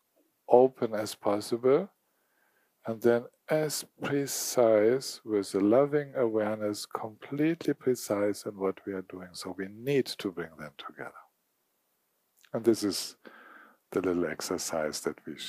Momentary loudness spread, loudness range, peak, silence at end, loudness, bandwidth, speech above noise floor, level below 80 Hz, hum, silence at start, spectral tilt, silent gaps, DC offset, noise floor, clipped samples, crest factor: 16 LU; 8 LU; -6 dBFS; 0 s; -29 LUFS; 15.5 kHz; 47 dB; -74 dBFS; none; 0.5 s; -4.5 dB/octave; none; under 0.1%; -76 dBFS; under 0.1%; 24 dB